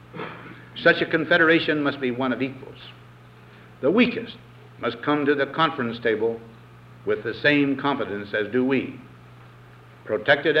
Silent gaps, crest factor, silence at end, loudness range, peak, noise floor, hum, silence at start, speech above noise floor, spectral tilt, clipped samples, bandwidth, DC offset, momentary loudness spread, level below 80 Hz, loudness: none; 20 dB; 0 s; 3 LU; -4 dBFS; -47 dBFS; none; 0.15 s; 25 dB; -7 dB/octave; under 0.1%; 6.8 kHz; under 0.1%; 19 LU; -62 dBFS; -22 LUFS